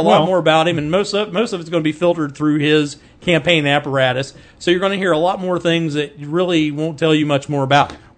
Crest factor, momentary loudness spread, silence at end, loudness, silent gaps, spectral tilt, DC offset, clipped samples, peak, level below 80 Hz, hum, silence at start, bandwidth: 16 dB; 7 LU; 0.2 s; -17 LUFS; none; -5.5 dB/octave; under 0.1%; under 0.1%; 0 dBFS; -52 dBFS; none; 0 s; 9.4 kHz